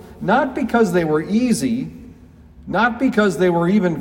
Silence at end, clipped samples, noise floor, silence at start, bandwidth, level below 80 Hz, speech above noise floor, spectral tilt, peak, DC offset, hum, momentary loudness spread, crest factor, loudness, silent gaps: 0 s; under 0.1%; -44 dBFS; 0 s; 16.5 kHz; -48 dBFS; 26 dB; -6 dB/octave; -4 dBFS; under 0.1%; none; 6 LU; 16 dB; -18 LUFS; none